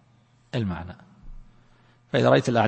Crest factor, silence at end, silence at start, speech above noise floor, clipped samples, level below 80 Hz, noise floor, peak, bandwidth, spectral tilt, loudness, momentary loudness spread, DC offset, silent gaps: 22 dB; 0 s; 0.55 s; 37 dB; under 0.1%; -50 dBFS; -60 dBFS; -4 dBFS; 8.8 kHz; -6.5 dB/octave; -24 LUFS; 21 LU; under 0.1%; none